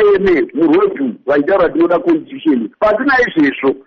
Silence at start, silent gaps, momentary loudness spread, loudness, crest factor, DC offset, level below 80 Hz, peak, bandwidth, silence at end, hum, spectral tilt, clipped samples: 0 s; none; 5 LU; -13 LUFS; 8 dB; under 0.1%; -44 dBFS; -4 dBFS; 6.2 kHz; 0.05 s; none; -7 dB/octave; under 0.1%